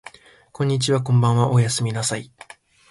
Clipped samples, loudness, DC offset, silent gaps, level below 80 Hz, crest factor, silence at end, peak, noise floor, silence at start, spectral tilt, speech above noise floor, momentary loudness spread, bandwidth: under 0.1%; -20 LUFS; under 0.1%; none; -54 dBFS; 18 dB; 0.65 s; -4 dBFS; -45 dBFS; 0.6 s; -5.5 dB/octave; 26 dB; 9 LU; 11.5 kHz